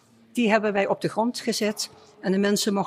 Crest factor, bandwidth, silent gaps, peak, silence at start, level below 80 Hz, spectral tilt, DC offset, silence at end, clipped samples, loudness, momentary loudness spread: 16 dB; 15.5 kHz; none; -8 dBFS; 0.35 s; -70 dBFS; -4.5 dB/octave; under 0.1%; 0 s; under 0.1%; -25 LUFS; 11 LU